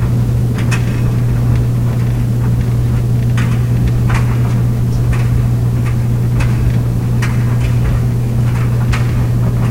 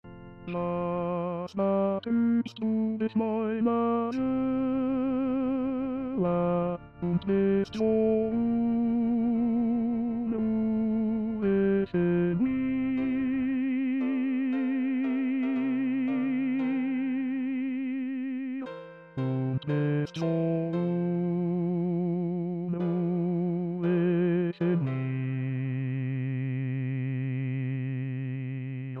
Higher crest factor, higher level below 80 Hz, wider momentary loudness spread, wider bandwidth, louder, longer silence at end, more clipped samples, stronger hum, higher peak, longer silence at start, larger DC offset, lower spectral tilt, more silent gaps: about the same, 12 dB vs 12 dB; first, -22 dBFS vs -60 dBFS; second, 1 LU vs 6 LU; first, 15.5 kHz vs 6.2 kHz; first, -14 LUFS vs -29 LUFS; about the same, 0 s vs 0 s; neither; neither; first, 0 dBFS vs -16 dBFS; about the same, 0 s vs 0.05 s; first, 2% vs under 0.1%; second, -7.5 dB/octave vs -10 dB/octave; neither